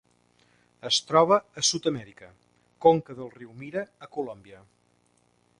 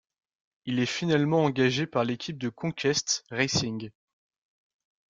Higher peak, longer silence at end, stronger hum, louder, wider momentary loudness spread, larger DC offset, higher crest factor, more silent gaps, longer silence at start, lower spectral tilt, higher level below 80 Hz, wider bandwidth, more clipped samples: first, -6 dBFS vs -10 dBFS; second, 1.05 s vs 1.3 s; first, 60 Hz at -65 dBFS vs none; about the same, -25 LUFS vs -27 LUFS; first, 20 LU vs 10 LU; neither; about the same, 22 dB vs 20 dB; neither; first, 0.85 s vs 0.65 s; about the same, -3.5 dB/octave vs -4.5 dB/octave; second, -68 dBFS vs -62 dBFS; first, 11.5 kHz vs 9.4 kHz; neither